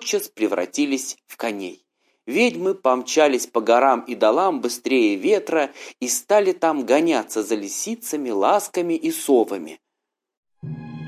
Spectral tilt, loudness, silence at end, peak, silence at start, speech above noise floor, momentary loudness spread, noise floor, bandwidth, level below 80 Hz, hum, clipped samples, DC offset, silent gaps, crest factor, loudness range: -3.5 dB/octave; -21 LUFS; 0 s; -4 dBFS; 0 s; 62 dB; 12 LU; -82 dBFS; 16 kHz; -72 dBFS; none; under 0.1%; under 0.1%; 10.37-10.43 s; 18 dB; 4 LU